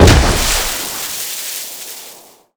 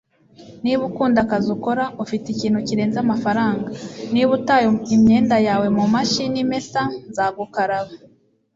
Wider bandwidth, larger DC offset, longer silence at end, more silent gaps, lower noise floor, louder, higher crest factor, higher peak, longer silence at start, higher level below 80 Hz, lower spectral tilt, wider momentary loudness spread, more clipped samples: first, over 20 kHz vs 7.8 kHz; neither; second, 0.35 s vs 0.6 s; neither; second, -40 dBFS vs -45 dBFS; first, -16 LUFS vs -19 LUFS; about the same, 16 dB vs 16 dB; first, 0 dBFS vs -4 dBFS; second, 0 s vs 0.4 s; first, -20 dBFS vs -54 dBFS; second, -3.5 dB/octave vs -5.5 dB/octave; first, 17 LU vs 9 LU; first, 0.6% vs under 0.1%